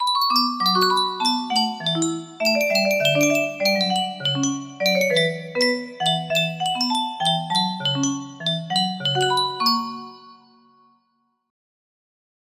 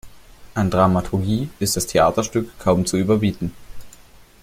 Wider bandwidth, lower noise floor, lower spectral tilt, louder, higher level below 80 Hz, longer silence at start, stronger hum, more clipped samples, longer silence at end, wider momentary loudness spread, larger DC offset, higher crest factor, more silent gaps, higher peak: about the same, 16 kHz vs 16 kHz; first, -69 dBFS vs -46 dBFS; second, -3 dB/octave vs -5.5 dB/octave; about the same, -20 LUFS vs -20 LUFS; second, -70 dBFS vs -42 dBFS; about the same, 0 s vs 0.05 s; neither; neither; first, 2.15 s vs 0.5 s; about the same, 6 LU vs 7 LU; neither; about the same, 16 dB vs 18 dB; neither; second, -6 dBFS vs -2 dBFS